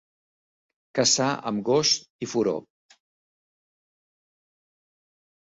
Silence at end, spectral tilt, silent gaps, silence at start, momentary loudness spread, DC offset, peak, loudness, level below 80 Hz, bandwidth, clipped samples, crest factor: 2.8 s; -3 dB/octave; 2.10-2.19 s; 0.95 s; 10 LU; under 0.1%; -8 dBFS; -24 LUFS; -70 dBFS; 8.2 kHz; under 0.1%; 22 dB